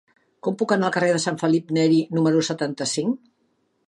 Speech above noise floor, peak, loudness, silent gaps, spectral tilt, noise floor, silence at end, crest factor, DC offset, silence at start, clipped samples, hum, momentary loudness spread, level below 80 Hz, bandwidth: 47 dB; -6 dBFS; -22 LUFS; none; -5 dB/octave; -68 dBFS; 0.7 s; 18 dB; under 0.1%; 0.45 s; under 0.1%; none; 8 LU; -72 dBFS; 11.5 kHz